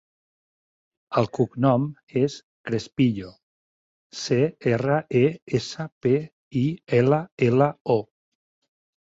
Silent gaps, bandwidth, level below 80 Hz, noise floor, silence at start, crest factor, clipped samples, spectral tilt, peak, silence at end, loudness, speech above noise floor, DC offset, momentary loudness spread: 2.03-2.07 s, 2.43-2.64 s, 3.43-4.10 s, 5.42-5.47 s, 5.92-6.01 s, 6.32-6.51 s, 7.32-7.37 s, 7.81-7.85 s; 7.8 kHz; -60 dBFS; under -90 dBFS; 1.1 s; 18 dB; under 0.1%; -7 dB/octave; -6 dBFS; 1 s; -24 LUFS; over 67 dB; under 0.1%; 10 LU